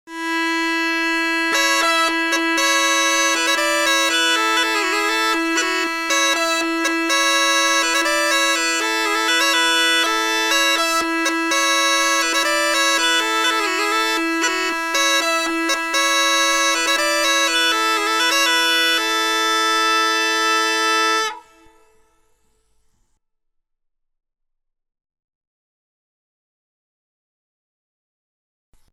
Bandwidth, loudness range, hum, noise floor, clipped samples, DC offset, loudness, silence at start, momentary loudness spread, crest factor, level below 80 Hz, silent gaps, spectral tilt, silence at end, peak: 19 kHz; 2 LU; none; -73 dBFS; under 0.1%; under 0.1%; -16 LUFS; 0.05 s; 4 LU; 14 dB; -58 dBFS; none; 2 dB/octave; 7.5 s; -4 dBFS